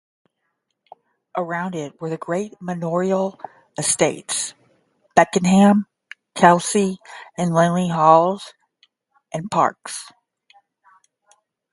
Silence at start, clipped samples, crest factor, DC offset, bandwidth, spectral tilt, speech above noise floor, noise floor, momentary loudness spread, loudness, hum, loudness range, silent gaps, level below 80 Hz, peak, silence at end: 1.35 s; under 0.1%; 22 dB; under 0.1%; 11.5 kHz; -5 dB/octave; 56 dB; -75 dBFS; 18 LU; -19 LUFS; none; 9 LU; none; -62 dBFS; 0 dBFS; 1.65 s